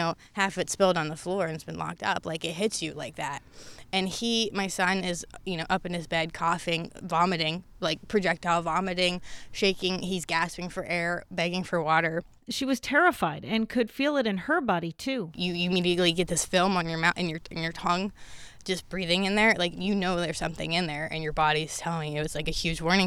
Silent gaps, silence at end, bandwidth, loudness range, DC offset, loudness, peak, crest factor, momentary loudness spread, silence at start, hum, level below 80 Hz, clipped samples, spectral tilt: none; 0 s; 16 kHz; 3 LU; under 0.1%; -28 LUFS; -8 dBFS; 20 dB; 9 LU; 0 s; none; -50 dBFS; under 0.1%; -4 dB/octave